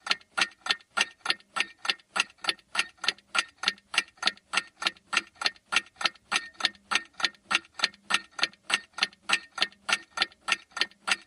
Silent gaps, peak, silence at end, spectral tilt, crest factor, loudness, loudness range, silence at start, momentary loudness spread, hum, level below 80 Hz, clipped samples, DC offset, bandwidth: none; -6 dBFS; 0.05 s; 1 dB/octave; 26 dB; -29 LUFS; 1 LU; 0.05 s; 4 LU; none; -74 dBFS; under 0.1%; under 0.1%; 15 kHz